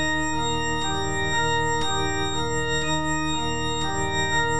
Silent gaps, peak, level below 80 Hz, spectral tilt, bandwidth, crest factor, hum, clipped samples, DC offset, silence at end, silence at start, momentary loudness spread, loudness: none; -12 dBFS; -40 dBFS; -3.5 dB/octave; 10 kHz; 12 dB; none; under 0.1%; 3%; 0 s; 0 s; 3 LU; -24 LUFS